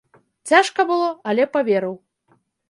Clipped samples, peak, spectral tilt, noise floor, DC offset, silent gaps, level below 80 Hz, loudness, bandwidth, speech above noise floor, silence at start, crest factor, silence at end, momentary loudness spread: under 0.1%; -2 dBFS; -4 dB/octave; -63 dBFS; under 0.1%; none; -74 dBFS; -19 LUFS; 11.5 kHz; 44 dB; 0.45 s; 20 dB; 0.75 s; 16 LU